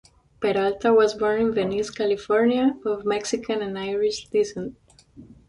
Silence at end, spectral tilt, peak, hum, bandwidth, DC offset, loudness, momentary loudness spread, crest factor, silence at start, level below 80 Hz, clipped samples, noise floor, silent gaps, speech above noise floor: 0.25 s; -4.5 dB/octave; -8 dBFS; none; 11 kHz; under 0.1%; -23 LUFS; 9 LU; 16 dB; 0.4 s; -56 dBFS; under 0.1%; -48 dBFS; none; 26 dB